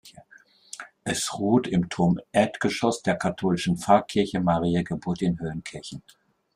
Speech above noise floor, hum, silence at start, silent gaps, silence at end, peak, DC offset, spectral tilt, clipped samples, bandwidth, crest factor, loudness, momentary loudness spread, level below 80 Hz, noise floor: 31 dB; none; 0.05 s; none; 0.55 s; -6 dBFS; under 0.1%; -5.5 dB/octave; under 0.1%; 14 kHz; 20 dB; -25 LUFS; 16 LU; -56 dBFS; -56 dBFS